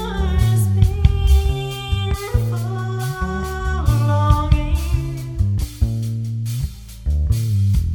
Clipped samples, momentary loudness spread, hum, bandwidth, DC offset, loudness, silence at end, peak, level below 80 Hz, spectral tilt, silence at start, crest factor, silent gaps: under 0.1%; 8 LU; none; 19 kHz; under 0.1%; -20 LUFS; 0 s; 0 dBFS; -22 dBFS; -6.5 dB/octave; 0 s; 18 dB; none